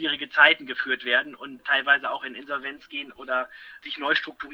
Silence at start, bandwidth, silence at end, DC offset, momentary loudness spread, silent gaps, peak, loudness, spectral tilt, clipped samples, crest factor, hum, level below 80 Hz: 0 s; 8.6 kHz; 0 s; under 0.1%; 18 LU; none; -2 dBFS; -23 LUFS; -3.5 dB/octave; under 0.1%; 24 dB; none; -70 dBFS